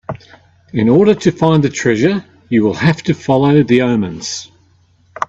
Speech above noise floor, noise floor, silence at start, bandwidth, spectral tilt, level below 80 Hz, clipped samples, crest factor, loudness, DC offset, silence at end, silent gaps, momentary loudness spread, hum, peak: 40 dB; -52 dBFS; 0.1 s; 8 kHz; -6.5 dB/octave; -48 dBFS; under 0.1%; 14 dB; -13 LUFS; under 0.1%; 0.05 s; none; 13 LU; none; 0 dBFS